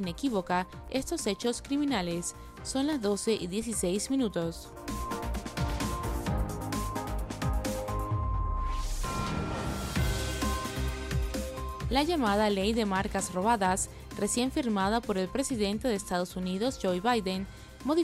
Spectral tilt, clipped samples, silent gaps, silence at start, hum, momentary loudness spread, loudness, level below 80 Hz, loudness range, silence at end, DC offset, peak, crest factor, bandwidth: -4.5 dB/octave; under 0.1%; none; 0 s; none; 8 LU; -31 LUFS; -40 dBFS; 5 LU; 0 s; under 0.1%; -12 dBFS; 18 dB; 16 kHz